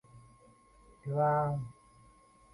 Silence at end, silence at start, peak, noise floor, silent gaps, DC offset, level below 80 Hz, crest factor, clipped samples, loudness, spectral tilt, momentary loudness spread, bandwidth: 0.8 s; 0.15 s; -18 dBFS; -62 dBFS; none; under 0.1%; -64 dBFS; 18 dB; under 0.1%; -32 LUFS; -9.5 dB/octave; 18 LU; 11 kHz